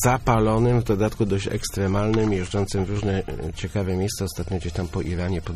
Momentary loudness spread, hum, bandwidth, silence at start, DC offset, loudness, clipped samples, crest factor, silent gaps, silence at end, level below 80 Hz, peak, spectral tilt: 8 LU; none; 14.5 kHz; 0 s; under 0.1%; -24 LUFS; under 0.1%; 16 dB; none; 0 s; -36 dBFS; -6 dBFS; -6 dB/octave